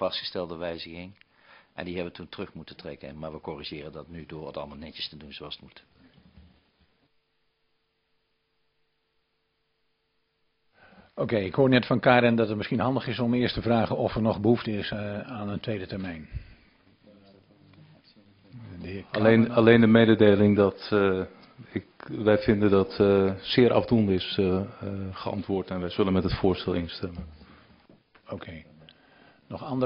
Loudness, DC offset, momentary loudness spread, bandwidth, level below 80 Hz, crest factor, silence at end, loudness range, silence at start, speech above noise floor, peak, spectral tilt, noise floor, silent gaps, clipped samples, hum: -25 LUFS; under 0.1%; 21 LU; 5.6 kHz; -52 dBFS; 24 dB; 0 s; 18 LU; 0 s; 50 dB; -4 dBFS; -9.5 dB/octave; -75 dBFS; none; under 0.1%; none